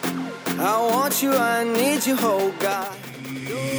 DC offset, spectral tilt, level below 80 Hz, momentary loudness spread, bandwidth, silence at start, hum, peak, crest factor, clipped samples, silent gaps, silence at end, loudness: under 0.1%; -3.5 dB/octave; -68 dBFS; 12 LU; over 20 kHz; 0 s; none; -8 dBFS; 14 dB; under 0.1%; none; 0 s; -22 LUFS